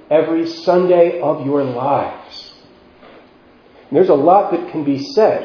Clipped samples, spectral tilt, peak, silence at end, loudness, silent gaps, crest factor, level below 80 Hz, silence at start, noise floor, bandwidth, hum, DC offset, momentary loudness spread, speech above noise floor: under 0.1%; -7.5 dB/octave; 0 dBFS; 0 s; -15 LUFS; none; 16 dB; -60 dBFS; 0.1 s; -47 dBFS; 5.4 kHz; none; under 0.1%; 10 LU; 32 dB